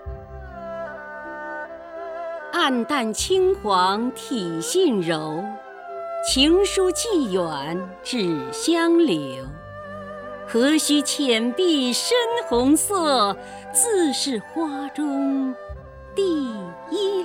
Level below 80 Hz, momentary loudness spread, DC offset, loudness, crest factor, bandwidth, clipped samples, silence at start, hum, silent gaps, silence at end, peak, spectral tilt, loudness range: -46 dBFS; 17 LU; under 0.1%; -21 LUFS; 18 dB; 18 kHz; under 0.1%; 0 s; none; none; 0 s; -6 dBFS; -3 dB/octave; 4 LU